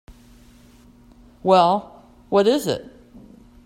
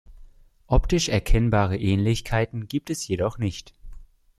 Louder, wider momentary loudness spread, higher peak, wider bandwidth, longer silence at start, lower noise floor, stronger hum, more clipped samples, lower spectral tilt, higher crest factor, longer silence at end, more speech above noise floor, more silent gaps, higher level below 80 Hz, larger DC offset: first, -19 LUFS vs -24 LUFS; first, 11 LU vs 8 LU; first, -4 dBFS vs -8 dBFS; first, 16 kHz vs 14 kHz; first, 1.45 s vs 0.1 s; about the same, -50 dBFS vs -49 dBFS; neither; neither; about the same, -5.5 dB/octave vs -5.5 dB/octave; about the same, 20 dB vs 16 dB; first, 0.85 s vs 0.35 s; first, 32 dB vs 26 dB; neither; second, -54 dBFS vs -30 dBFS; neither